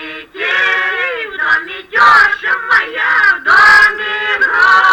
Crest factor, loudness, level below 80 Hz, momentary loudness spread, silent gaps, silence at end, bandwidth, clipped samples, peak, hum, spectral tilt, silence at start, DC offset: 10 dB; -10 LUFS; -48 dBFS; 11 LU; none; 0 s; 18 kHz; under 0.1%; -2 dBFS; none; -1 dB/octave; 0 s; under 0.1%